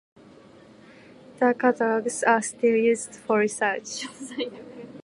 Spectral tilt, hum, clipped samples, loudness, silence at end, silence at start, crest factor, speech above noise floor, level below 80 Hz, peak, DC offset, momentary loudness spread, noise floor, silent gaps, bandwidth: -3.5 dB/octave; none; under 0.1%; -24 LUFS; 0.05 s; 1.3 s; 20 dB; 26 dB; -72 dBFS; -4 dBFS; under 0.1%; 13 LU; -50 dBFS; none; 11.5 kHz